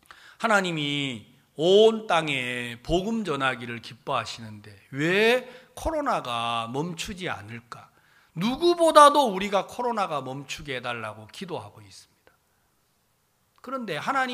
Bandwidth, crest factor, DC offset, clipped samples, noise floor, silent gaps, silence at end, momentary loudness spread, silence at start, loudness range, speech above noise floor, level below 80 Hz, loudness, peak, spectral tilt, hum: 15.5 kHz; 24 dB; under 0.1%; under 0.1%; -69 dBFS; none; 0 s; 21 LU; 0.4 s; 12 LU; 44 dB; -52 dBFS; -24 LUFS; -2 dBFS; -4.5 dB/octave; none